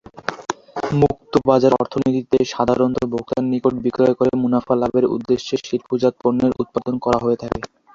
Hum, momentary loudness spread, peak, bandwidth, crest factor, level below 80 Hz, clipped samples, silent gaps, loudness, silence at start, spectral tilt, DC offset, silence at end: none; 8 LU; 0 dBFS; 7.6 kHz; 18 dB; -48 dBFS; under 0.1%; none; -19 LUFS; 0.15 s; -7 dB/octave; under 0.1%; 0.3 s